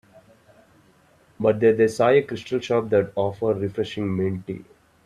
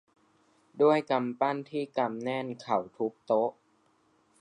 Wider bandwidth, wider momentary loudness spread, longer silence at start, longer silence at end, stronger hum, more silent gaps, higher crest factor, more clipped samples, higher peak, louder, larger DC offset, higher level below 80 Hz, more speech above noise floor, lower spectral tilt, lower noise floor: first, 11.5 kHz vs 9.8 kHz; about the same, 9 LU vs 9 LU; first, 1.4 s vs 0.75 s; second, 0.45 s vs 0.9 s; neither; neither; about the same, 18 dB vs 18 dB; neither; first, -6 dBFS vs -12 dBFS; first, -22 LUFS vs -30 LUFS; neither; first, -60 dBFS vs -82 dBFS; about the same, 36 dB vs 39 dB; about the same, -7 dB/octave vs -7 dB/octave; second, -57 dBFS vs -68 dBFS